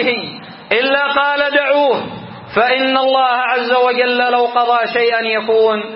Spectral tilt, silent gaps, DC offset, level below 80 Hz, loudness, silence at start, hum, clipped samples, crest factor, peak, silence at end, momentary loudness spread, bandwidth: -8.5 dB/octave; none; under 0.1%; -60 dBFS; -14 LUFS; 0 s; none; under 0.1%; 14 dB; 0 dBFS; 0 s; 8 LU; 5.8 kHz